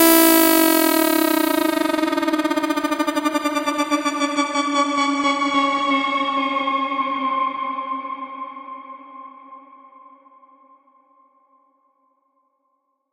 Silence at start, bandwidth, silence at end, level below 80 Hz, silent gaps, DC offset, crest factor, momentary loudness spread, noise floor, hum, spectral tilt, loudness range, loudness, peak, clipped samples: 0 s; 16 kHz; 3.55 s; -60 dBFS; none; under 0.1%; 20 dB; 18 LU; -70 dBFS; none; -1 dB/octave; 15 LU; -19 LUFS; -2 dBFS; under 0.1%